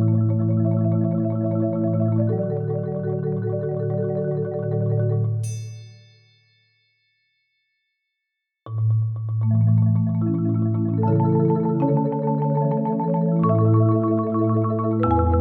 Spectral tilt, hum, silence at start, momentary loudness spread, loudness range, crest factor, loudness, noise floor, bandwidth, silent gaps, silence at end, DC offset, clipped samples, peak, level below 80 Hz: -10.5 dB/octave; none; 0 s; 7 LU; 9 LU; 14 dB; -22 LUFS; -81 dBFS; 8.8 kHz; none; 0 s; under 0.1%; under 0.1%; -6 dBFS; -44 dBFS